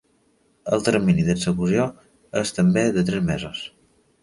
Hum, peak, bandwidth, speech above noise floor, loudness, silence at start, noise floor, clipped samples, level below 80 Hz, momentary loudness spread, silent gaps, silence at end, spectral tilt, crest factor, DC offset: none; -4 dBFS; 11.5 kHz; 42 dB; -22 LUFS; 0.65 s; -63 dBFS; under 0.1%; -48 dBFS; 12 LU; none; 0.55 s; -6 dB/octave; 18 dB; under 0.1%